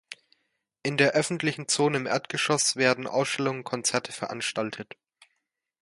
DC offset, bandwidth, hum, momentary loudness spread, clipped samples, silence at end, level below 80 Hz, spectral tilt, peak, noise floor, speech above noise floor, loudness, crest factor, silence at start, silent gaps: under 0.1%; 11.5 kHz; none; 12 LU; under 0.1%; 1 s; -72 dBFS; -3 dB/octave; -6 dBFS; -79 dBFS; 52 dB; -26 LUFS; 22 dB; 0.1 s; none